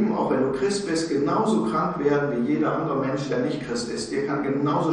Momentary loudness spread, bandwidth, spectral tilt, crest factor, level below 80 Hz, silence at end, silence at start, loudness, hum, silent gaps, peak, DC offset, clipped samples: 5 LU; 10.5 kHz; -6 dB/octave; 14 dB; -56 dBFS; 0 s; 0 s; -24 LUFS; none; none; -10 dBFS; under 0.1%; under 0.1%